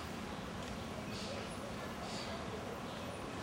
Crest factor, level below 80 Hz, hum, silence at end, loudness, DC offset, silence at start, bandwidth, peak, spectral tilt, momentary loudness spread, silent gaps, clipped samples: 14 dB; -58 dBFS; none; 0 s; -44 LUFS; under 0.1%; 0 s; 16 kHz; -30 dBFS; -4.5 dB/octave; 2 LU; none; under 0.1%